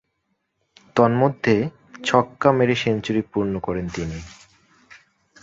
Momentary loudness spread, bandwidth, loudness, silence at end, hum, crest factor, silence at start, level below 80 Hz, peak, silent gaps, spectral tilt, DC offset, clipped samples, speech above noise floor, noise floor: 11 LU; 8 kHz; -21 LUFS; 1.1 s; none; 20 dB; 0.95 s; -48 dBFS; -2 dBFS; none; -6.5 dB/octave; under 0.1%; under 0.1%; 53 dB; -73 dBFS